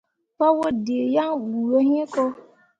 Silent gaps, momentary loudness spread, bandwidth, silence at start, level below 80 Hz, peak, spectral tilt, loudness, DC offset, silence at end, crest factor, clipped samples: none; 6 LU; 8.4 kHz; 0.4 s; -64 dBFS; -6 dBFS; -6.5 dB/octave; -22 LUFS; under 0.1%; 0.4 s; 16 dB; under 0.1%